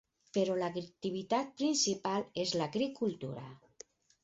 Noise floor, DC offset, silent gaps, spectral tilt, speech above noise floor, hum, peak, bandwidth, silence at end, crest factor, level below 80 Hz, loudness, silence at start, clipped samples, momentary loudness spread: -59 dBFS; under 0.1%; none; -4 dB/octave; 24 dB; none; -18 dBFS; 8 kHz; 0.65 s; 18 dB; -74 dBFS; -35 LUFS; 0.35 s; under 0.1%; 22 LU